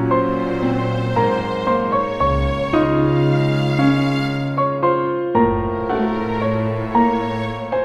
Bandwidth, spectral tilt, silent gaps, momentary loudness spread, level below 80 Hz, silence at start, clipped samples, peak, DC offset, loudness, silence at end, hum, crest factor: 9.6 kHz; -8 dB/octave; none; 5 LU; -34 dBFS; 0 s; under 0.1%; -4 dBFS; under 0.1%; -19 LUFS; 0 s; none; 14 dB